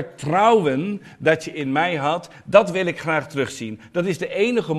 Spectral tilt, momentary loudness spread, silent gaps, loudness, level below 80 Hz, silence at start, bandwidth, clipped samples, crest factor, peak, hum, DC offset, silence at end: -5.5 dB/octave; 10 LU; none; -21 LUFS; -60 dBFS; 0 s; 13 kHz; under 0.1%; 20 dB; 0 dBFS; none; under 0.1%; 0 s